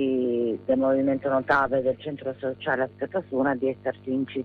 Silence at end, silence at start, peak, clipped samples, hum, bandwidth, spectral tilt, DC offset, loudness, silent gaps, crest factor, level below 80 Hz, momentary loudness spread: 0 s; 0 s; -10 dBFS; under 0.1%; 50 Hz at -50 dBFS; 5 kHz; -8.5 dB/octave; under 0.1%; -26 LUFS; none; 14 dB; -60 dBFS; 9 LU